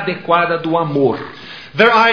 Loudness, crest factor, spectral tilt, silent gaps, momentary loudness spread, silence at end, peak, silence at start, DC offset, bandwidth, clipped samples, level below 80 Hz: -15 LUFS; 14 dB; -6.5 dB/octave; none; 16 LU; 0 s; 0 dBFS; 0 s; 0.4%; 5.4 kHz; under 0.1%; -56 dBFS